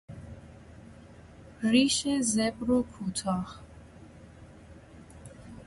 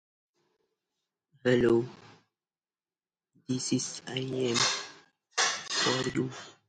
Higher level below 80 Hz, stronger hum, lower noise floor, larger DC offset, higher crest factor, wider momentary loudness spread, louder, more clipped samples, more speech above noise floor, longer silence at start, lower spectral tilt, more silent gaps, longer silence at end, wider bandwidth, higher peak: first, -54 dBFS vs -66 dBFS; neither; second, -51 dBFS vs under -90 dBFS; neither; about the same, 22 dB vs 20 dB; first, 26 LU vs 10 LU; about the same, -28 LUFS vs -29 LUFS; neither; second, 23 dB vs over 61 dB; second, 0.1 s vs 1.45 s; about the same, -4 dB/octave vs -3.5 dB/octave; neither; second, 0 s vs 0.15 s; about the same, 11.5 kHz vs 11 kHz; first, -10 dBFS vs -14 dBFS